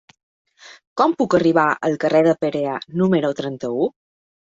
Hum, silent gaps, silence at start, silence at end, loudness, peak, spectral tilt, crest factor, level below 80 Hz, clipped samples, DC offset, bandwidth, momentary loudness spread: none; 0.87-0.96 s; 0.65 s; 0.7 s; -19 LUFS; -2 dBFS; -7 dB/octave; 18 dB; -60 dBFS; under 0.1%; under 0.1%; 7.8 kHz; 9 LU